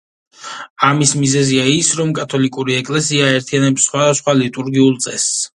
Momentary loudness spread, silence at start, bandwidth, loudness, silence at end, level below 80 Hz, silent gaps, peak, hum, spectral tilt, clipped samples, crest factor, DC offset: 5 LU; 0.4 s; 11.5 kHz; -14 LUFS; 0.1 s; -56 dBFS; 0.70-0.76 s; 0 dBFS; none; -4 dB/octave; under 0.1%; 16 dB; under 0.1%